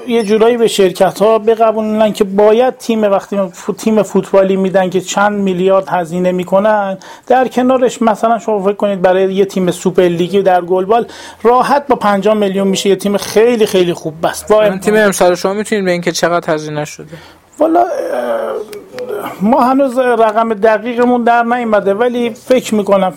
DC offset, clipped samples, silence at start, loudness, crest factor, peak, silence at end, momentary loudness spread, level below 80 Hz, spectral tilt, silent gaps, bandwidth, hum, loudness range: under 0.1%; under 0.1%; 0 s; -12 LUFS; 12 dB; 0 dBFS; 0 s; 7 LU; -50 dBFS; -5 dB/octave; none; 17 kHz; none; 3 LU